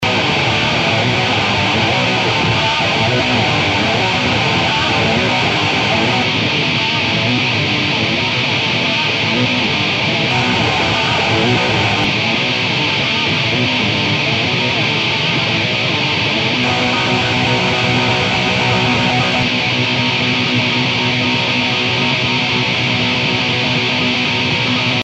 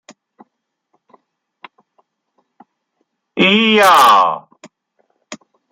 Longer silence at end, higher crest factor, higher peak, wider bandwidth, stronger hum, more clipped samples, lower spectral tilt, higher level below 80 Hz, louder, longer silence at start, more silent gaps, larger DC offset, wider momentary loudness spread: second, 0 s vs 0.35 s; about the same, 14 dB vs 18 dB; about the same, -2 dBFS vs 0 dBFS; second, 8.6 kHz vs 15.5 kHz; neither; neither; about the same, -4.5 dB/octave vs -3.5 dB/octave; first, -42 dBFS vs -64 dBFS; second, -14 LUFS vs -10 LUFS; second, 0 s vs 3.35 s; neither; neither; second, 1 LU vs 28 LU